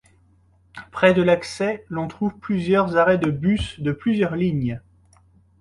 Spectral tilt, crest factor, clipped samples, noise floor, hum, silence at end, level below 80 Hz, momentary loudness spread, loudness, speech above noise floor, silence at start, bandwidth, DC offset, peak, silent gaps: -7 dB/octave; 18 dB; under 0.1%; -57 dBFS; none; 0.8 s; -46 dBFS; 11 LU; -21 LUFS; 37 dB; 0.75 s; 11.5 kHz; under 0.1%; -4 dBFS; none